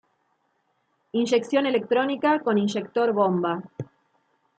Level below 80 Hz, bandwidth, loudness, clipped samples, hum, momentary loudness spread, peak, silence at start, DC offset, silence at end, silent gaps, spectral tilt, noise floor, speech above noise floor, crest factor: -74 dBFS; 9.2 kHz; -24 LUFS; under 0.1%; none; 10 LU; -8 dBFS; 1.15 s; under 0.1%; 0.75 s; none; -6 dB/octave; -71 dBFS; 48 dB; 18 dB